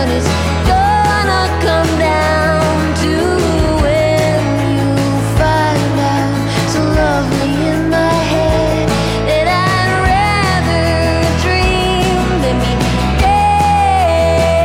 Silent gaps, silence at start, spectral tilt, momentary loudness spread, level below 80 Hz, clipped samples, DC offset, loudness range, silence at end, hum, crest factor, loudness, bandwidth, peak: none; 0 s; -5.5 dB/octave; 3 LU; -22 dBFS; under 0.1%; under 0.1%; 1 LU; 0 s; none; 12 dB; -13 LUFS; 16.5 kHz; 0 dBFS